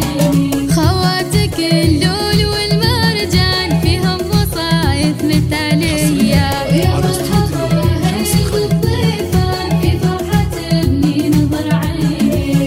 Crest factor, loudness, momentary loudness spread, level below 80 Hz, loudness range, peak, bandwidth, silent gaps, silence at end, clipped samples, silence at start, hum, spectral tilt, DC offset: 12 dB; -14 LUFS; 3 LU; -26 dBFS; 1 LU; 0 dBFS; 16.5 kHz; none; 0 s; under 0.1%; 0 s; none; -5.5 dB/octave; under 0.1%